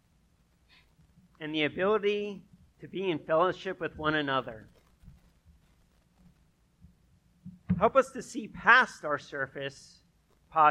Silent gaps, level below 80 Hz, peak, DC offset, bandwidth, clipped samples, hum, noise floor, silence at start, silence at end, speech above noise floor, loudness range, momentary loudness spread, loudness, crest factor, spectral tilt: none; -60 dBFS; -6 dBFS; under 0.1%; 12.5 kHz; under 0.1%; none; -67 dBFS; 1.4 s; 0 s; 38 dB; 8 LU; 19 LU; -29 LUFS; 26 dB; -5 dB/octave